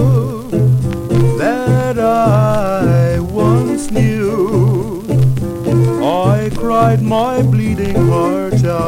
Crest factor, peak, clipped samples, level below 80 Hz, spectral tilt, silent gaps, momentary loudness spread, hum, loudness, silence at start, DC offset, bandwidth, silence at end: 12 dB; 0 dBFS; under 0.1%; -34 dBFS; -8 dB/octave; none; 4 LU; none; -14 LUFS; 0 s; under 0.1%; 15 kHz; 0 s